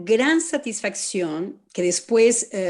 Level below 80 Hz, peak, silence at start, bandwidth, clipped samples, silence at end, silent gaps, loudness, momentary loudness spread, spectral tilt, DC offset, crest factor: -70 dBFS; -6 dBFS; 0 s; 12 kHz; under 0.1%; 0 s; none; -21 LUFS; 10 LU; -3 dB/octave; under 0.1%; 16 dB